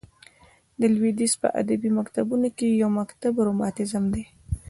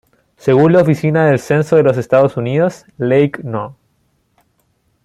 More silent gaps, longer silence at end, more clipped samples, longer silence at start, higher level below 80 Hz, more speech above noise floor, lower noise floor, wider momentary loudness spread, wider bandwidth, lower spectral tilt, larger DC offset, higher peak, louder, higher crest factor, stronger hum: neither; second, 0 s vs 1.3 s; neither; first, 0.8 s vs 0.45 s; first, -46 dBFS vs -54 dBFS; second, 34 dB vs 49 dB; second, -57 dBFS vs -61 dBFS; second, 5 LU vs 12 LU; second, 11.5 kHz vs 13 kHz; second, -5.5 dB/octave vs -8 dB/octave; neither; second, -8 dBFS vs 0 dBFS; second, -24 LUFS vs -14 LUFS; about the same, 16 dB vs 14 dB; neither